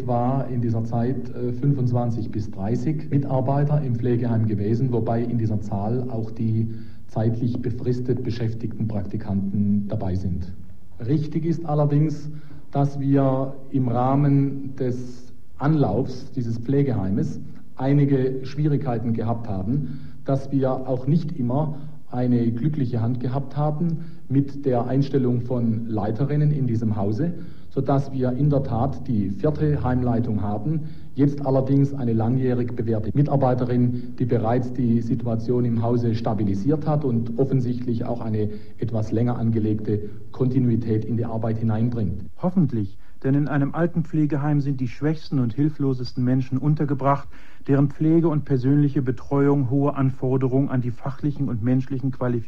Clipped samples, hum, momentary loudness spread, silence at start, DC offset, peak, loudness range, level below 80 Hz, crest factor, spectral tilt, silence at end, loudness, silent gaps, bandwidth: under 0.1%; none; 8 LU; 0 s; 3%; -6 dBFS; 3 LU; -48 dBFS; 16 dB; -10 dB/octave; 0 s; -23 LUFS; none; 6.8 kHz